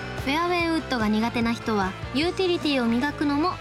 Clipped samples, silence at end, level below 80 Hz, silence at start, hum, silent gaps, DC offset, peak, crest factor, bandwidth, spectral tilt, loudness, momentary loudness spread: under 0.1%; 0 s; -44 dBFS; 0 s; none; none; under 0.1%; -10 dBFS; 14 dB; 15 kHz; -5.5 dB/octave; -24 LUFS; 3 LU